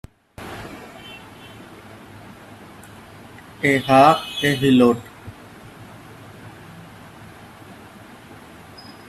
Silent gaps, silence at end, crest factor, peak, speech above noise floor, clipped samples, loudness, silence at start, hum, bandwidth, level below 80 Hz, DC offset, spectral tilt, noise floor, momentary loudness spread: none; 2.3 s; 22 dB; 0 dBFS; 27 dB; under 0.1%; -16 LUFS; 0.4 s; none; 13.5 kHz; -56 dBFS; under 0.1%; -5.5 dB/octave; -43 dBFS; 27 LU